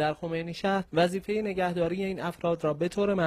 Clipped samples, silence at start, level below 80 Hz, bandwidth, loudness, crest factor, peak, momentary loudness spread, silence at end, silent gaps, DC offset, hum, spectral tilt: under 0.1%; 0 s; -58 dBFS; 14.5 kHz; -29 LUFS; 16 dB; -14 dBFS; 5 LU; 0 s; none; under 0.1%; none; -6.5 dB/octave